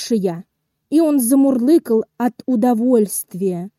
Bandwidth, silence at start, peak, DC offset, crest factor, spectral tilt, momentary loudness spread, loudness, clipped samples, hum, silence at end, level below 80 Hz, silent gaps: 16.5 kHz; 0 s; -4 dBFS; under 0.1%; 12 dB; -6 dB/octave; 8 LU; -17 LUFS; under 0.1%; none; 0.1 s; -70 dBFS; none